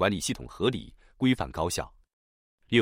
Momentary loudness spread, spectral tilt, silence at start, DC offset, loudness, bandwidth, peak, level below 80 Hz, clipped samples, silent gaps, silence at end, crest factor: 8 LU; -4.5 dB/octave; 0 s; under 0.1%; -29 LUFS; 16 kHz; -8 dBFS; -50 dBFS; under 0.1%; 2.13-2.58 s; 0 s; 20 dB